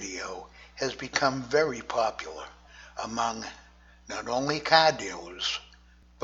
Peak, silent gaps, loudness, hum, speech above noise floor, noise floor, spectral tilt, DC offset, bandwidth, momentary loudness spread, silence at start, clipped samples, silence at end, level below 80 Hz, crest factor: -4 dBFS; none; -28 LUFS; 60 Hz at -55 dBFS; 28 dB; -56 dBFS; -3 dB/octave; under 0.1%; 8 kHz; 20 LU; 0 s; under 0.1%; 0 s; -58 dBFS; 26 dB